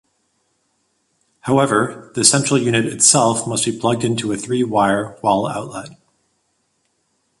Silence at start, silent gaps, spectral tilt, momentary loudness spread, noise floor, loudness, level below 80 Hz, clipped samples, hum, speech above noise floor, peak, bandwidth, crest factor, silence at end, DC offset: 1.45 s; none; -3.5 dB/octave; 12 LU; -67 dBFS; -16 LUFS; -56 dBFS; under 0.1%; none; 50 dB; 0 dBFS; 12 kHz; 20 dB; 1.45 s; under 0.1%